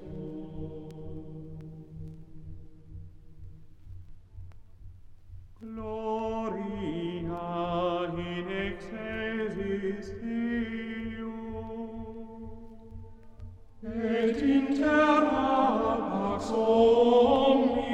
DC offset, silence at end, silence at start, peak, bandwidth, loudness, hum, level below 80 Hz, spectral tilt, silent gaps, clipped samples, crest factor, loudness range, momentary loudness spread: under 0.1%; 0 s; 0 s; -10 dBFS; 9.2 kHz; -28 LUFS; none; -50 dBFS; -7 dB/octave; none; under 0.1%; 20 dB; 23 LU; 26 LU